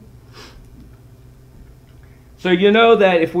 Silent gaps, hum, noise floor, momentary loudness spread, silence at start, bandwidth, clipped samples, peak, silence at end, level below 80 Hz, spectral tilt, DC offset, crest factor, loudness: none; none; -44 dBFS; 9 LU; 0.4 s; 10.5 kHz; under 0.1%; 0 dBFS; 0 s; -46 dBFS; -6.5 dB/octave; under 0.1%; 18 dB; -13 LUFS